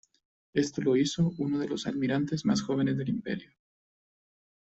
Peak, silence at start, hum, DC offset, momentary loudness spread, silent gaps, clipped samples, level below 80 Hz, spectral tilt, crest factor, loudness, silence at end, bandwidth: -14 dBFS; 0.55 s; none; under 0.1%; 7 LU; none; under 0.1%; -64 dBFS; -6 dB/octave; 18 dB; -30 LUFS; 1.2 s; 8.2 kHz